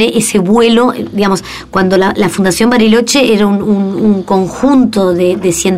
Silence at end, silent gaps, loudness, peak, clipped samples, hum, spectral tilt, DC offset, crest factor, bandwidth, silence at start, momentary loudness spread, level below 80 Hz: 0 s; none; -10 LUFS; 0 dBFS; under 0.1%; none; -5 dB/octave; 0.8%; 10 dB; 16 kHz; 0 s; 5 LU; -40 dBFS